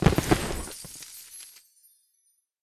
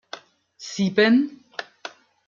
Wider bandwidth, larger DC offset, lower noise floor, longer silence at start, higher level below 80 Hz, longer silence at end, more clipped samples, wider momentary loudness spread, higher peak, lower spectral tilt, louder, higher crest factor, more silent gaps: first, 14.5 kHz vs 7.4 kHz; neither; first, -71 dBFS vs -48 dBFS; second, 0 s vs 0.15 s; first, -40 dBFS vs -70 dBFS; first, 1.15 s vs 0.4 s; neither; second, 19 LU vs 22 LU; about the same, -6 dBFS vs -6 dBFS; about the same, -5 dB/octave vs -5.5 dB/octave; second, -29 LUFS vs -20 LUFS; about the same, 24 dB vs 20 dB; neither